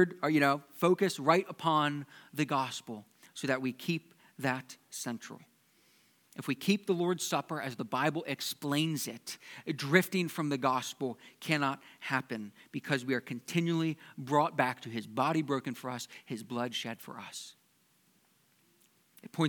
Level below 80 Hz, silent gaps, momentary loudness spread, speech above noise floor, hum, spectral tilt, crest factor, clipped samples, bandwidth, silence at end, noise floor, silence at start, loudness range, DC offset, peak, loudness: -88 dBFS; none; 15 LU; 37 dB; none; -5 dB/octave; 26 dB; under 0.1%; 19 kHz; 0 s; -70 dBFS; 0 s; 6 LU; under 0.1%; -8 dBFS; -33 LUFS